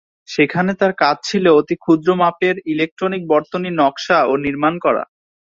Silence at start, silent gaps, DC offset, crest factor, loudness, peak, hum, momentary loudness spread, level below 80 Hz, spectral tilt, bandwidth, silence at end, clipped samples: 0.3 s; 2.91-2.97 s; under 0.1%; 16 dB; -17 LUFS; -2 dBFS; none; 7 LU; -58 dBFS; -6 dB/octave; 7.8 kHz; 0.35 s; under 0.1%